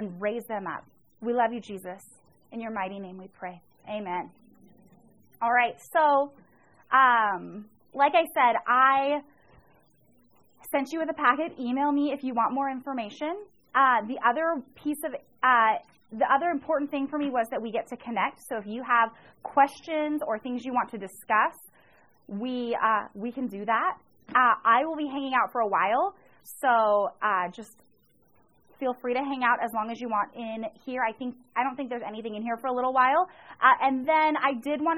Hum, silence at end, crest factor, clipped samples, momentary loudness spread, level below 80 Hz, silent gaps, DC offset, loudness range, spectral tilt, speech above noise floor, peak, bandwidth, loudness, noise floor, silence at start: none; 0 s; 22 dB; under 0.1%; 14 LU; -72 dBFS; none; under 0.1%; 7 LU; -4.5 dB/octave; 39 dB; -6 dBFS; 16 kHz; -26 LUFS; -66 dBFS; 0 s